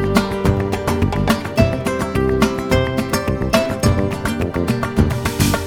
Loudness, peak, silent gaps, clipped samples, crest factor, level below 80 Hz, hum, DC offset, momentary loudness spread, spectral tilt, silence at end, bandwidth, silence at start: -18 LUFS; 0 dBFS; none; under 0.1%; 16 dB; -28 dBFS; none; under 0.1%; 3 LU; -6 dB/octave; 0 s; over 20 kHz; 0 s